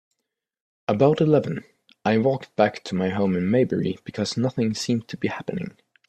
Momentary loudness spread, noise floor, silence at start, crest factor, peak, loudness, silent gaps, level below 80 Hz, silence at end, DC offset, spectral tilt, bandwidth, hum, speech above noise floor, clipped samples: 12 LU; -81 dBFS; 0.9 s; 20 dB; -4 dBFS; -23 LUFS; none; -62 dBFS; 0.4 s; under 0.1%; -6.5 dB/octave; 12 kHz; none; 59 dB; under 0.1%